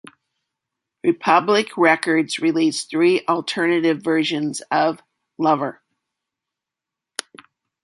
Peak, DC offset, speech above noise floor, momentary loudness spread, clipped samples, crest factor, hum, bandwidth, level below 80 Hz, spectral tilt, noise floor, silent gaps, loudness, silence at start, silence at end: -2 dBFS; under 0.1%; 67 dB; 12 LU; under 0.1%; 20 dB; none; 11.5 kHz; -72 dBFS; -4.5 dB/octave; -86 dBFS; none; -19 LUFS; 1.05 s; 2.1 s